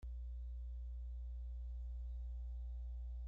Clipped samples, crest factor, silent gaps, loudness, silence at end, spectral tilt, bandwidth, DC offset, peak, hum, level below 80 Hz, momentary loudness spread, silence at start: under 0.1%; 4 dB; none; -50 LUFS; 0 s; -9.5 dB/octave; 0.8 kHz; under 0.1%; -42 dBFS; 60 Hz at -45 dBFS; -46 dBFS; 1 LU; 0 s